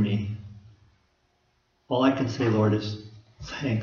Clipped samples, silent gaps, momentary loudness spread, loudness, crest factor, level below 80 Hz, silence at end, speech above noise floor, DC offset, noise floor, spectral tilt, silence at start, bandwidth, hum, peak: under 0.1%; none; 20 LU; -26 LUFS; 20 dB; -56 dBFS; 0 s; 45 dB; under 0.1%; -69 dBFS; -7.5 dB/octave; 0 s; 7 kHz; none; -8 dBFS